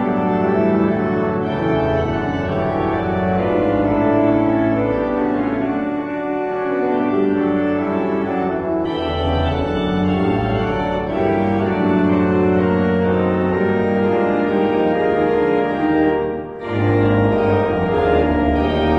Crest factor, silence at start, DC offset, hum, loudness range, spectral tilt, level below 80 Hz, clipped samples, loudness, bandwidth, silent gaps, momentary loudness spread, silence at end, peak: 14 dB; 0 s; under 0.1%; none; 3 LU; -9 dB/octave; -36 dBFS; under 0.1%; -18 LUFS; 6.2 kHz; none; 5 LU; 0 s; -4 dBFS